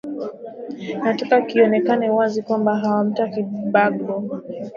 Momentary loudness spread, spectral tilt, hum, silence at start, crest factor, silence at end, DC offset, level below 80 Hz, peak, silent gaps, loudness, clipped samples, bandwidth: 14 LU; -7.5 dB/octave; none; 0.05 s; 18 dB; 0 s; under 0.1%; -68 dBFS; -2 dBFS; none; -20 LUFS; under 0.1%; 7.2 kHz